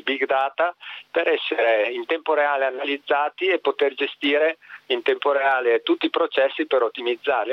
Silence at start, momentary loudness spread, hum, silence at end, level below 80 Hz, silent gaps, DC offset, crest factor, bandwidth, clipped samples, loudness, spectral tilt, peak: 0.05 s; 5 LU; none; 0 s; -74 dBFS; none; under 0.1%; 16 dB; 6 kHz; under 0.1%; -22 LUFS; -4 dB/octave; -6 dBFS